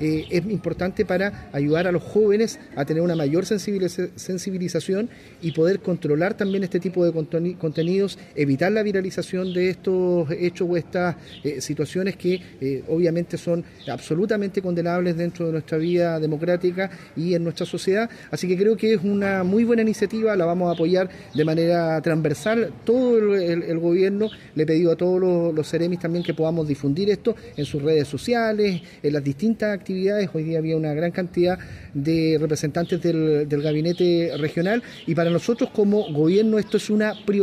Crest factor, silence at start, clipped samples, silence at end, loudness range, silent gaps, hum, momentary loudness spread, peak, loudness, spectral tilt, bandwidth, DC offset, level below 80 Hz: 14 dB; 0 s; under 0.1%; 0 s; 3 LU; none; none; 7 LU; -8 dBFS; -22 LUFS; -7 dB/octave; 14.5 kHz; under 0.1%; -56 dBFS